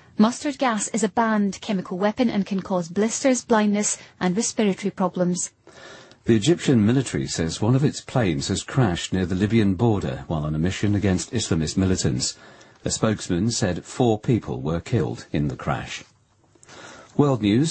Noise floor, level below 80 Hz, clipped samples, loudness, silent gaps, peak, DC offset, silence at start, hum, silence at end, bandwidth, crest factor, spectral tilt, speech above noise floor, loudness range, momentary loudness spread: -59 dBFS; -46 dBFS; under 0.1%; -23 LUFS; none; -4 dBFS; under 0.1%; 0.2 s; none; 0 s; 8.8 kHz; 18 dB; -5.5 dB/octave; 37 dB; 3 LU; 8 LU